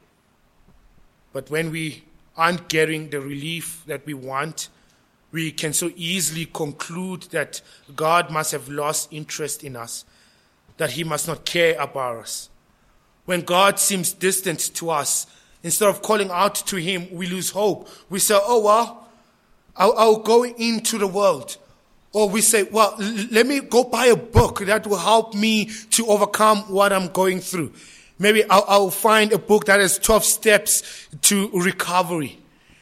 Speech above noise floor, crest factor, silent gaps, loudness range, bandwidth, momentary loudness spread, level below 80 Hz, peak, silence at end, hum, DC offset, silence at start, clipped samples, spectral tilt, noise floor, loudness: 40 dB; 20 dB; none; 9 LU; 16.5 kHz; 14 LU; -46 dBFS; 0 dBFS; 0.5 s; none; under 0.1%; 1.35 s; under 0.1%; -3 dB/octave; -61 dBFS; -20 LUFS